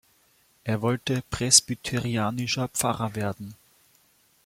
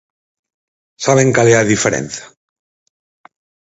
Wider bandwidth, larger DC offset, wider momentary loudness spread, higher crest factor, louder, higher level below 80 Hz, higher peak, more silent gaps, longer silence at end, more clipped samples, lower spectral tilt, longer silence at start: first, 16.5 kHz vs 8.2 kHz; neither; about the same, 14 LU vs 14 LU; first, 26 dB vs 18 dB; second, -24 LUFS vs -13 LUFS; about the same, -54 dBFS vs -50 dBFS; about the same, -2 dBFS vs 0 dBFS; neither; second, 0.9 s vs 1.35 s; neither; second, -3 dB/octave vs -4.5 dB/octave; second, 0.65 s vs 1 s